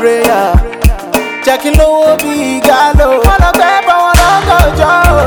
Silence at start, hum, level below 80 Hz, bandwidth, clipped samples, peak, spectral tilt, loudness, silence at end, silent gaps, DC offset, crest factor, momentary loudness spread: 0 s; none; -14 dBFS; over 20 kHz; 2%; 0 dBFS; -5 dB/octave; -8 LUFS; 0 s; none; under 0.1%; 8 dB; 5 LU